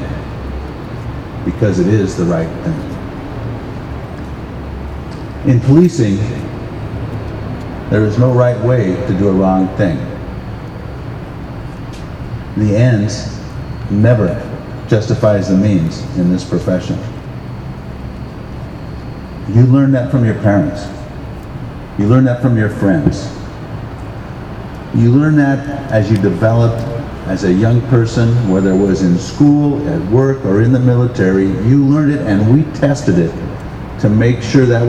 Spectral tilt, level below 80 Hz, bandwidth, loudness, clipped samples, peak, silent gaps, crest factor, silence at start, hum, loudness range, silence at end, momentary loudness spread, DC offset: -8 dB/octave; -32 dBFS; 9 kHz; -13 LUFS; under 0.1%; 0 dBFS; none; 14 dB; 0 s; none; 6 LU; 0 s; 16 LU; under 0.1%